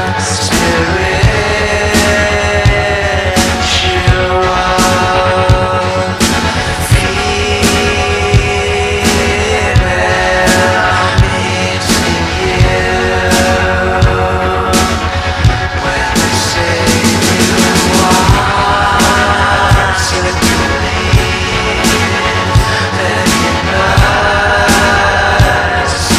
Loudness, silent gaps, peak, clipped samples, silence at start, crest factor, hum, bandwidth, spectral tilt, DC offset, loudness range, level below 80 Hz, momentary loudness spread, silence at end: -10 LUFS; none; 0 dBFS; 0.3%; 0 s; 10 dB; none; 16 kHz; -4 dB/octave; under 0.1%; 2 LU; -20 dBFS; 4 LU; 0 s